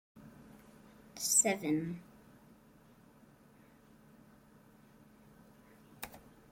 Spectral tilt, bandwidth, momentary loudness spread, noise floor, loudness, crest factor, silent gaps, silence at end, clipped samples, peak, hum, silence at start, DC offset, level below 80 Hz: -2.5 dB/octave; 16.5 kHz; 30 LU; -62 dBFS; -31 LUFS; 26 dB; none; 0.35 s; under 0.1%; -14 dBFS; none; 0.15 s; under 0.1%; -72 dBFS